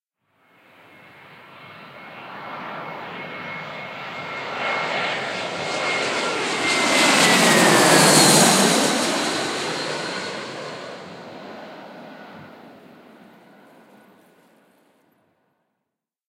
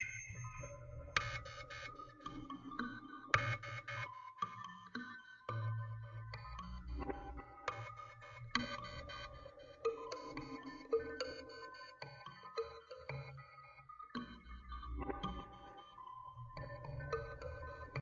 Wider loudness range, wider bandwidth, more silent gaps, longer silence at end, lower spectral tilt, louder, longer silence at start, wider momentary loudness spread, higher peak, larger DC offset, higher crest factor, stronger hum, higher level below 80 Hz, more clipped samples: first, 22 LU vs 7 LU; first, 16 kHz vs 7.4 kHz; neither; first, 3.55 s vs 0 s; about the same, -2.5 dB/octave vs -3.5 dB/octave; first, -18 LUFS vs -46 LUFS; first, 1.3 s vs 0 s; first, 25 LU vs 13 LU; first, -2 dBFS vs -14 dBFS; neither; second, 22 dB vs 32 dB; neither; second, -72 dBFS vs -58 dBFS; neither